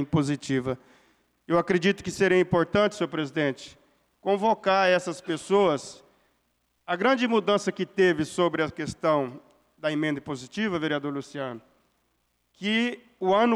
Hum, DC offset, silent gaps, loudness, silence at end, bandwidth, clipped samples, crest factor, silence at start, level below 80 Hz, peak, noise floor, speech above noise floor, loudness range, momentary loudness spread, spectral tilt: none; under 0.1%; none; -26 LUFS; 0 s; 12 kHz; under 0.1%; 14 dB; 0 s; -60 dBFS; -12 dBFS; -72 dBFS; 47 dB; 5 LU; 12 LU; -5.5 dB/octave